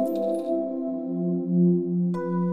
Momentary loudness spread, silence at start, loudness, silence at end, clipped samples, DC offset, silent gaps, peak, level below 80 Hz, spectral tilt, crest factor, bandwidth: 7 LU; 0 s; -25 LUFS; 0 s; under 0.1%; under 0.1%; none; -12 dBFS; -70 dBFS; -10.5 dB/octave; 12 dB; 14.5 kHz